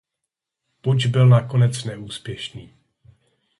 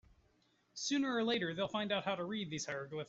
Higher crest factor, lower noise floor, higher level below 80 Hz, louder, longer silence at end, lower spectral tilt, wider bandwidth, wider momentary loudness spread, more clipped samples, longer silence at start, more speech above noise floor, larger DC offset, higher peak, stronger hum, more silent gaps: about the same, 16 dB vs 16 dB; first, -82 dBFS vs -74 dBFS; first, -56 dBFS vs -74 dBFS; first, -19 LUFS vs -37 LUFS; first, 0.95 s vs 0.05 s; first, -6.5 dB/octave vs -4 dB/octave; first, 11.5 kHz vs 8.2 kHz; first, 17 LU vs 7 LU; neither; about the same, 0.85 s vs 0.75 s; first, 64 dB vs 37 dB; neither; first, -6 dBFS vs -24 dBFS; neither; neither